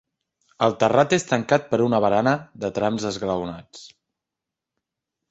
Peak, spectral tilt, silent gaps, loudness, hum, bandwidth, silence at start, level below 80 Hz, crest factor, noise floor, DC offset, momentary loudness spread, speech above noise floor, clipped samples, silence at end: -2 dBFS; -5.5 dB/octave; none; -22 LUFS; none; 8.2 kHz; 0.6 s; -58 dBFS; 20 dB; -86 dBFS; under 0.1%; 9 LU; 65 dB; under 0.1%; 1.45 s